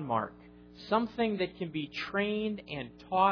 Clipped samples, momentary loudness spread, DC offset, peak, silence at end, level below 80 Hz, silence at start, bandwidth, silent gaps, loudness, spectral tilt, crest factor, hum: under 0.1%; 11 LU; under 0.1%; -14 dBFS; 0 s; -62 dBFS; 0 s; 5.4 kHz; none; -33 LUFS; -7 dB/octave; 18 dB; 60 Hz at -60 dBFS